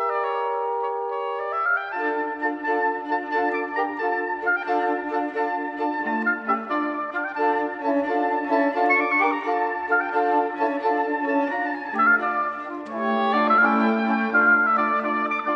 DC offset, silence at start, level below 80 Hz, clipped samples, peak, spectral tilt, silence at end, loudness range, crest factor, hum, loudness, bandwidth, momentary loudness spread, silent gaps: under 0.1%; 0 s; -72 dBFS; under 0.1%; -8 dBFS; -6.5 dB/octave; 0 s; 4 LU; 16 dB; none; -23 LUFS; 6.6 kHz; 8 LU; none